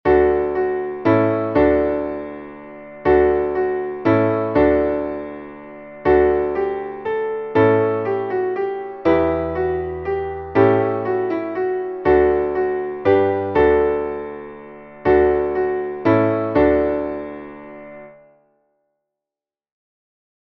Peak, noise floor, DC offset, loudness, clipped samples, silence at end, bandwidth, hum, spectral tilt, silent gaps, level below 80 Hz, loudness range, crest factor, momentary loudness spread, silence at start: -2 dBFS; -90 dBFS; under 0.1%; -19 LUFS; under 0.1%; 2.4 s; 5.4 kHz; none; -10 dB/octave; none; -40 dBFS; 2 LU; 18 dB; 17 LU; 0.05 s